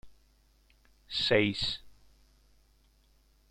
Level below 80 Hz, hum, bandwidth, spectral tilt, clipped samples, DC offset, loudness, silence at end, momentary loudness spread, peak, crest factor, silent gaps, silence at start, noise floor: -58 dBFS; none; 14 kHz; -4.5 dB/octave; under 0.1%; under 0.1%; -30 LUFS; 1.6 s; 11 LU; -12 dBFS; 24 dB; none; 0.05 s; -66 dBFS